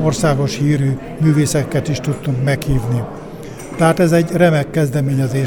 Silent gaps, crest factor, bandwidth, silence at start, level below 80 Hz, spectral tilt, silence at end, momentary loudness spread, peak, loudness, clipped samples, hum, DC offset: none; 14 dB; 17.5 kHz; 0 s; -36 dBFS; -6.5 dB/octave; 0 s; 9 LU; 0 dBFS; -16 LUFS; under 0.1%; none; under 0.1%